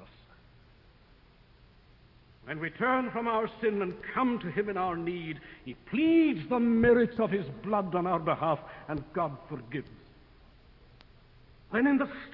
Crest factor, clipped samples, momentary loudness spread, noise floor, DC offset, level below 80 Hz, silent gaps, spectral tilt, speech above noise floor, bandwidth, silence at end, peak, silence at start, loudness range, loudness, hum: 18 dB; under 0.1%; 16 LU; -59 dBFS; under 0.1%; -58 dBFS; none; -10 dB/octave; 30 dB; 5.4 kHz; 0 s; -12 dBFS; 0 s; 9 LU; -30 LUFS; none